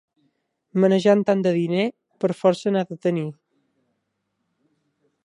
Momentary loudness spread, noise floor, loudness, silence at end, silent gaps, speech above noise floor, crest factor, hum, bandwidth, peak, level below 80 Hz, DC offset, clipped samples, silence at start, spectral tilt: 10 LU; -75 dBFS; -21 LUFS; 1.95 s; none; 55 dB; 18 dB; none; 10.5 kHz; -4 dBFS; -74 dBFS; under 0.1%; under 0.1%; 0.75 s; -7 dB/octave